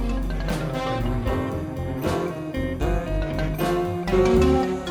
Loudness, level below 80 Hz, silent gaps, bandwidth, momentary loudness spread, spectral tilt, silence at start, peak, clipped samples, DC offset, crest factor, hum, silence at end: -24 LUFS; -30 dBFS; none; 19.5 kHz; 9 LU; -7 dB/octave; 0 s; -8 dBFS; under 0.1%; under 0.1%; 16 dB; none; 0 s